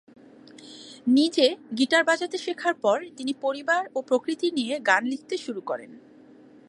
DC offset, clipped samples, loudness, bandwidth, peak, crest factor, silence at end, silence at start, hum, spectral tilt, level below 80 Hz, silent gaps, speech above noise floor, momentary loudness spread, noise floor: under 0.1%; under 0.1%; -25 LUFS; 11.5 kHz; -6 dBFS; 20 dB; 0.7 s; 0.6 s; none; -3 dB/octave; -80 dBFS; none; 26 dB; 11 LU; -51 dBFS